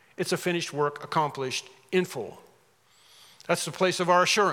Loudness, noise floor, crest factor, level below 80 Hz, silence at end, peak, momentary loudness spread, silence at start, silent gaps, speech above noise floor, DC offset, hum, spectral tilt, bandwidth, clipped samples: -27 LUFS; -62 dBFS; 20 dB; -82 dBFS; 0 s; -8 dBFS; 12 LU; 0.2 s; none; 36 dB; under 0.1%; none; -3.5 dB/octave; 17 kHz; under 0.1%